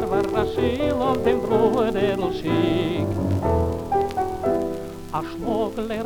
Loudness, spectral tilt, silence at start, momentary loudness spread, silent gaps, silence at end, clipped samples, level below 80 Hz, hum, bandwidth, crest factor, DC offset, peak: -23 LUFS; -7 dB/octave; 0 s; 7 LU; none; 0 s; under 0.1%; -40 dBFS; none; 20 kHz; 16 dB; under 0.1%; -6 dBFS